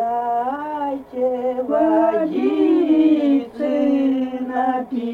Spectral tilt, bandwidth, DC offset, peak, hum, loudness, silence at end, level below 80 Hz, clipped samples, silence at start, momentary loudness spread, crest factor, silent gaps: -7.5 dB/octave; 4.6 kHz; under 0.1%; -6 dBFS; none; -19 LUFS; 0 s; -58 dBFS; under 0.1%; 0 s; 9 LU; 12 dB; none